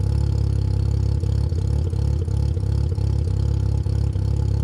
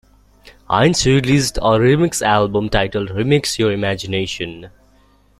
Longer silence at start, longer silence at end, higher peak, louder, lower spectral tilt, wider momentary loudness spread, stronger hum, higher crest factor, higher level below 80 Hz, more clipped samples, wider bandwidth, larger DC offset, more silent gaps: second, 0 s vs 0.45 s; second, 0 s vs 0.7 s; second, -12 dBFS vs -2 dBFS; second, -22 LUFS vs -16 LUFS; first, -8.5 dB/octave vs -5 dB/octave; second, 1 LU vs 8 LU; second, none vs 50 Hz at -40 dBFS; second, 10 dB vs 16 dB; first, -24 dBFS vs -36 dBFS; neither; second, 10.5 kHz vs 15.5 kHz; neither; neither